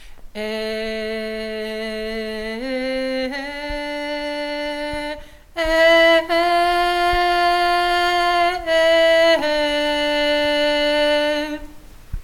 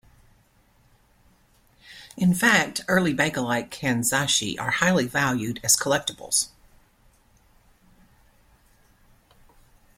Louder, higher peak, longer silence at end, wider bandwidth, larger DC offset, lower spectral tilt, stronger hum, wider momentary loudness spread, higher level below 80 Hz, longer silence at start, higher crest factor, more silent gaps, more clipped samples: first, -19 LUFS vs -22 LUFS; about the same, -4 dBFS vs -6 dBFS; second, 0 s vs 3.5 s; about the same, 16.5 kHz vs 16.5 kHz; neither; about the same, -3 dB/octave vs -3 dB/octave; neither; first, 13 LU vs 7 LU; first, -40 dBFS vs -58 dBFS; second, 0 s vs 1.9 s; second, 16 dB vs 22 dB; neither; neither